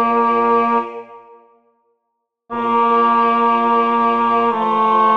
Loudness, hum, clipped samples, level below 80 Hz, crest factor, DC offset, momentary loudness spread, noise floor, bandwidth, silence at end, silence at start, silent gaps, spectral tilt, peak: -15 LUFS; none; under 0.1%; -70 dBFS; 12 dB; under 0.1%; 8 LU; -74 dBFS; 6.2 kHz; 0 s; 0 s; none; -6.5 dB/octave; -4 dBFS